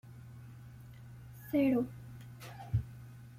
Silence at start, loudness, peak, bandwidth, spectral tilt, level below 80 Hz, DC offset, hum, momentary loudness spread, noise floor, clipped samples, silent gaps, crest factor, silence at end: 0.05 s; -34 LUFS; -20 dBFS; 16 kHz; -8.5 dB/octave; -56 dBFS; under 0.1%; none; 22 LU; -51 dBFS; under 0.1%; none; 18 dB; 0.05 s